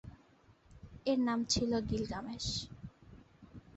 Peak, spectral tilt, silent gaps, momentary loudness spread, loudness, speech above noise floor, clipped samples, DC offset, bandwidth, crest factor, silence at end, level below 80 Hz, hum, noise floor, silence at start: -18 dBFS; -4.5 dB/octave; none; 24 LU; -35 LUFS; 30 dB; under 0.1%; under 0.1%; 8.2 kHz; 20 dB; 0 s; -54 dBFS; none; -65 dBFS; 0.05 s